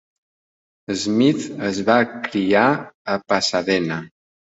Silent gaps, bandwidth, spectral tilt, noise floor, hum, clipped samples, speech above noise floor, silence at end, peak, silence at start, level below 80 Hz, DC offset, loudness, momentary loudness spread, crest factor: 2.94-3.05 s; 8.2 kHz; -4.5 dB/octave; under -90 dBFS; none; under 0.1%; over 71 dB; 0.5 s; -2 dBFS; 0.9 s; -58 dBFS; under 0.1%; -20 LUFS; 9 LU; 18 dB